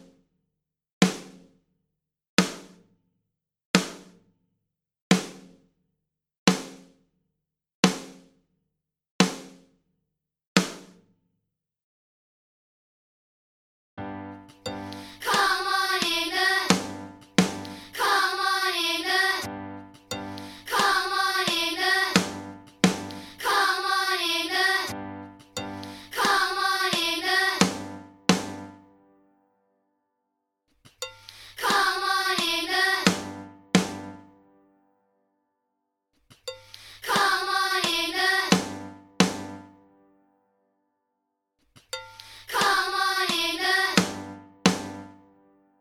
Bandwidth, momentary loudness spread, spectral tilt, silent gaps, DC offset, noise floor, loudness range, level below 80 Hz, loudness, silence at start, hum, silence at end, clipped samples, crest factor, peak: 16.5 kHz; 18 LU; -3 dB/octave; 2.28-2.37 s, 3.65-3.74 s, 5.01-5.10 s, 6.38-6.46 s, 7.74-7.83 s, 9.10-9.19 s, 10.47-10.55 s, 11.83-13.97 s; under 0.1%; -82 dBFS; 9 LU; -62 dBFS; -24 LUFS; 1 s; none; 0.7 s; under 0.1%; 28 dB; 0 dBFS